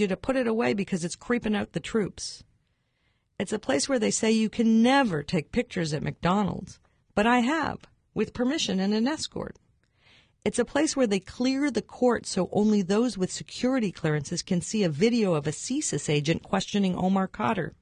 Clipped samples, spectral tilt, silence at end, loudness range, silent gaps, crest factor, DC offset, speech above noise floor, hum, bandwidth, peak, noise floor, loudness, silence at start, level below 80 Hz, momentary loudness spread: under 0.1%; -5 dB/octave; 0.1 s; 4 LU; none; 18 dB; under 0.1%; 46 dB; none; 10.5 kHz; -10 dBFS; -72 dBFS; -26 LUFS; 0 s; -54 dBFS; 9 LU